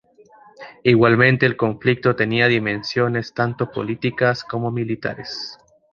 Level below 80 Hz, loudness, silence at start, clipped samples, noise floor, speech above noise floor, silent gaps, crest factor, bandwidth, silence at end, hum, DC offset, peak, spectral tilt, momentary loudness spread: -56 dBFS; -19 LUFS; 0.6 s; under 0.1%; -49 dBFS; 30 dB; none; 18 dB; 7 kHz; 0.4 s; none; under 0.1%; -2 dBFS; -7 dB/octave; 12 LU